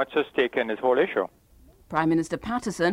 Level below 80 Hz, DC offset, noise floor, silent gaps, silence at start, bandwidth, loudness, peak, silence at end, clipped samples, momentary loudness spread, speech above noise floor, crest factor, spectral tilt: -56 dBFS; under 0.1%; -54 dBFS; none; 0 s; 14 kHz; -26 LUFS; -8 dBFS; 0 s; under 0.1%; 7 LU; 29 dB; 16 dB; -5.5 dB/octave